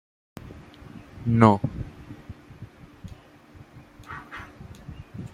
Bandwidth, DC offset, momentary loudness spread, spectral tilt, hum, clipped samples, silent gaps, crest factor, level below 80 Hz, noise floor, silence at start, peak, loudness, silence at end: 10 kHz; under 0.1%; 28 LU; -8.5 dB/octave; none; under 0.1%; none; 26 dB; -50 dBFS; -50 dBFS; 0.45 s; -2 dBFS; -23 LUFS; 0.05 s